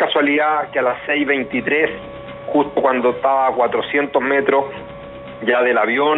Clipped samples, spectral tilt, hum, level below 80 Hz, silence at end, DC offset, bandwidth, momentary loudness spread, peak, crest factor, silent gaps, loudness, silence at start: under 0.1%; -7 dB/octave; none; -52 dBFS; 0 s; under 0.1%; 4.1 kHz; 16 LU; -2 dBFS; 16 dB; none; -17 LUFS; 0 s